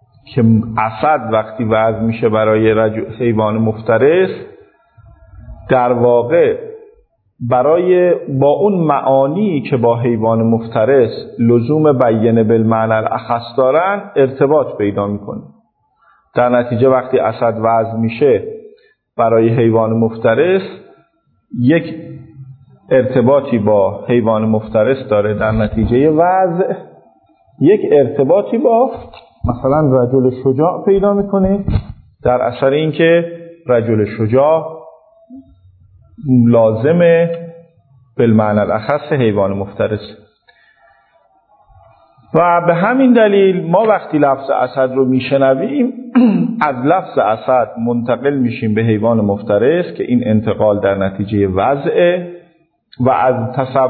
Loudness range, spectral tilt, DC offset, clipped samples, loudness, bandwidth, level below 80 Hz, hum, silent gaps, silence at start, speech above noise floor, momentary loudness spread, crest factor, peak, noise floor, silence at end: 3 LU; -12 dB/octave; under 0.1%; under 0.1%; -13 LUFS; 4.5 kHz; -40 dBFS; none; none; 0.3 s; 45 dB; 7 LU; 14 dB; 0 dBFS; -58 dBFS; 0 s